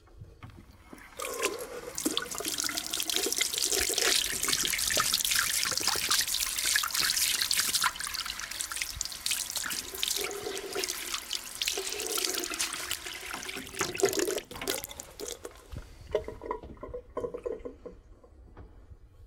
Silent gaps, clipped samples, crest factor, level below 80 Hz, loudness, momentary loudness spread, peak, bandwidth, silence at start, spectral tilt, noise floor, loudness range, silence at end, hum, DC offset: none; under 0.1%; 24 dB; -54 dBFS; -29 LUFS; 15 LU; -10 dBFS; 19 kHz; 0.05 s; 0 dB/octave; -53 dBFS; 12 LU; 0 s; none; under 0.1%